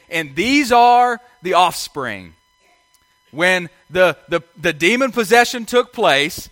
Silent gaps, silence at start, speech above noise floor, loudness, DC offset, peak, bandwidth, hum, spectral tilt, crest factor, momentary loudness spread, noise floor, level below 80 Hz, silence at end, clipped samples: none; 0.1 s; 42 dB; -16 LUFS; under 0.1%; 0 dBFS; 17 kHz; none; -3.5 dB/octave; 18 dB; 12 LU; -58 dBFS; -52 dBFS; 0.05 s; under 0.1%